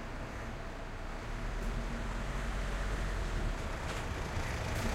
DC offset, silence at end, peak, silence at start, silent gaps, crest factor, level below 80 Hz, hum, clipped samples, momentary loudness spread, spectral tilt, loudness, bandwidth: under 0.1%; 0 s; -22 dBFS; 0 s; none; 16 dB; -38 dBFS; none; under 0.1%; 6 LU; -5 dB/octave; -39 LUFS; 15.5 kHz